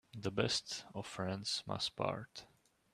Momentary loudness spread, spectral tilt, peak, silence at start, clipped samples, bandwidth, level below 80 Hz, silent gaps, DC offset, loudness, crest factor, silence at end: 11 LU; -3.5 dB/octave; -18 dBFS; 0.15 s; under 0.1%; 14 kHz; -70 dBFS; none; under 0.1%; -39 LUFS; 24 dB; 0.45 s